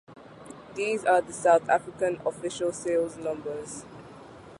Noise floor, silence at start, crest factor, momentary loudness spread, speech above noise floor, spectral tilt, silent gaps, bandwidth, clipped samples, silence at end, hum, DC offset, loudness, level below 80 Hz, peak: -47 dBFS; 0.1 s; 20 dB; 23 LU; 20 dB; -4 dB/octave; none; 11.5 kHz; under 0.1%; 0 s; none; under 0.1%; -27 LUFS; -64 dBFS; -8 dBFS